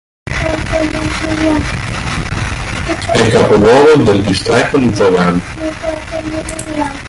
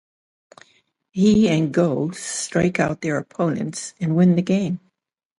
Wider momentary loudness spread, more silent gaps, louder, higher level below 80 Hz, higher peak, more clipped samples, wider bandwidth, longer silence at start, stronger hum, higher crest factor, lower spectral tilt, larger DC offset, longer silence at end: first, 13 LU vs 10 LU; neither; first, -13 LUFS vs -20 LUFS; first, -28 dBFS vs -52 dBFS; first, 0 dBFS vs -6 dBFS; neither; about the same, 11.5 kHz vs 11.5 kHz; second, 0.25 s vs 1.15 s; neither; about the same, 12 dB vs 16 dB; about the same, -5.5 dB/octave vs -6 dB/octave; neither; second, 0 s vs 0.6 s